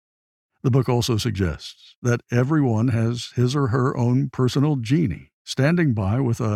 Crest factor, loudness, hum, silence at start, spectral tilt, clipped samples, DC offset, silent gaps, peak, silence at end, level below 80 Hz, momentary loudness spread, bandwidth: 14 dB; -22 LUFS; none; 0.65 s; -6.5 dB/octave; under 0.1%; under 0.1%; 1.96-2.02 s, 5.33-5.45 s; -6 dBFS; 0 s; -48 dBFS; 7 LU; 14 kHz